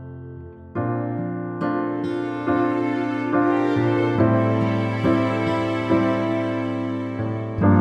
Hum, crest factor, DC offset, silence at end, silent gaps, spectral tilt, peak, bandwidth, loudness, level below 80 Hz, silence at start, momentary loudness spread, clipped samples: none; 16 dB; under 0.1%; 0 s; none; -8.5 dB/octave; -6 dBFS; 8.4 kHz; -22 LUFS; -52 dBFS; 0 s; 8 LU; under 0.1%